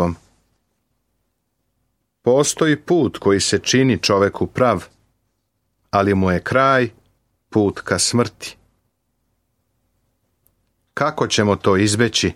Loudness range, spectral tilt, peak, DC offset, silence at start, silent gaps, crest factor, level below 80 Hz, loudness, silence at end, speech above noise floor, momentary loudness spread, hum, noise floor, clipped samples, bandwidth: 7 LU; -4.5 dB/octave; -2 dBFS; under 0.1%; 0 s; none; 18 dB; -50 dBFS; -17 LUFS; 0 s; 54 dB; 8 LU; none; -71 dBFS; under 0.1%; 15.5 kHz